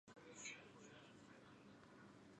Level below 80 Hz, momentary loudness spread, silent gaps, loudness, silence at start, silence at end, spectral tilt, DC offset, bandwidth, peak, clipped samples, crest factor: -88 dBFS; 10 LU; none; -60 LUFS; 0.05 s; 0 s; -3 dB/octave; under 0.1%; 10 kHz; -40 dBFS; under 0.1%; 22 dB